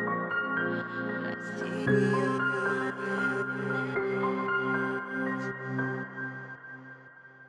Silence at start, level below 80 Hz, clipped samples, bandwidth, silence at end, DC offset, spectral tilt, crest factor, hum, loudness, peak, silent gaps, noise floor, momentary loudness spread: 0 s; -72 dBFS; under 0.1%; 10.5 kHz; 0 s; under 0.1%; -7 dB/octave; 18 dB; none; -30 LUFS; -14 dBFS; none; -52 dBFS; 15 LU